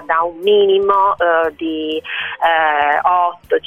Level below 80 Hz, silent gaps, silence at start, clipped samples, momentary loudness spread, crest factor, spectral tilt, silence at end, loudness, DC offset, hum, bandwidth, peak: -54 dBFS; none; 0 s; under 0.1%; 9 LU; 14 dB; -5 dB/octave; 0.1 s; -15 LUFS; under 0.1%; none; 3.8 kHz; -2 dBFS